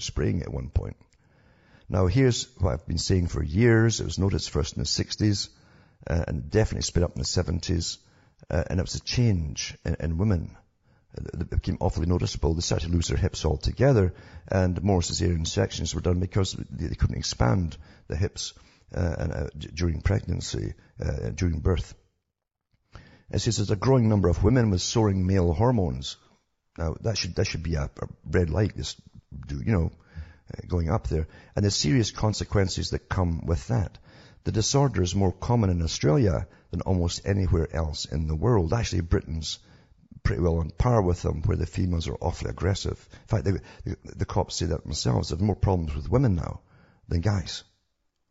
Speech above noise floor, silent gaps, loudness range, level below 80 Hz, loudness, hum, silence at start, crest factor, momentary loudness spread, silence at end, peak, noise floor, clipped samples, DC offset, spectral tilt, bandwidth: 58 dB; none; 5 LU; -38 dBFS; -26 LUFS; none; 0 s; 20 dB; 12 LU; 0.7 s; -6 dBFS; -83 dBFS; under 0.1%; under 0.1%; -6 dB/octave; 8 kHz